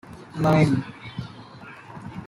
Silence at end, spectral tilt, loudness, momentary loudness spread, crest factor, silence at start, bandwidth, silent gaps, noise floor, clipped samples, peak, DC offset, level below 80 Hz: 0 s; -7.5 dB/octave; -21 LUFS; 23 LU; 20 dB; 0.05 s; 11.5 kHz; none; -43 dBFS; under 0.1%; -6 dBFS; under 0.1%; -54 dBFS